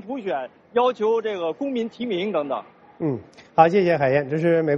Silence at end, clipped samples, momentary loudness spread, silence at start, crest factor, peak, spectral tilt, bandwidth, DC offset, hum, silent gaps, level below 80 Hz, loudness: 0 s; under 0.1%; 12 LU; 0.05 s; 20 dB; -2 dBFS; -7.5 dB/octave; 7.2 kHz; under 0.1%; none; none; -64 dBFS; -22 LUFS